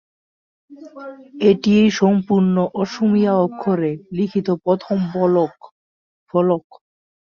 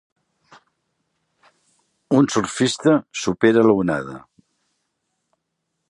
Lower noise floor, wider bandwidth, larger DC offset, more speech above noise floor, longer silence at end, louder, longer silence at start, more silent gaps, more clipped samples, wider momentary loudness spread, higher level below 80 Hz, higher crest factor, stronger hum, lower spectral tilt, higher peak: first, under -90 dBFS vs -76 dBFS; second, 7 kHz vs 11 kHz; neither; first, over 72 dB vs 59 dB; second, 0.7 s vs 1.7 s; about the same, -18 LUFS vs -18 LUFS; second, 0.7 s vs 2.1 s; first, 5.71-6.26 s vs none; neither; about the same, 9 LU vs 11 LU; about the same, -58 dBFS vs -58 dBFS; about the same, 16 dB vs 20 dB; neither; first, -7.5 dB/octave vs -5 dB/octave; about the same, -2 dBFS vs -2 dBFS